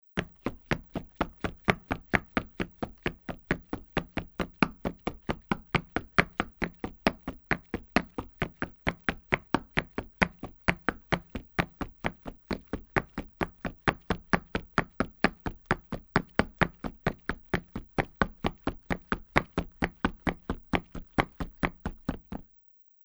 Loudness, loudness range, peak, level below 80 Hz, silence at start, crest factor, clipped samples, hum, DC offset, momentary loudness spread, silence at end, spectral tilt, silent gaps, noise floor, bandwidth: -32 LUFS; 3 LU; 0 dBFS; -46 dBFS; 0.15 s; 32 dB; under 0.1%; none; under 0.1%; 9 LU; 0.6 s; -6 dB/octave; none; -60 dBFS; over 20 kHz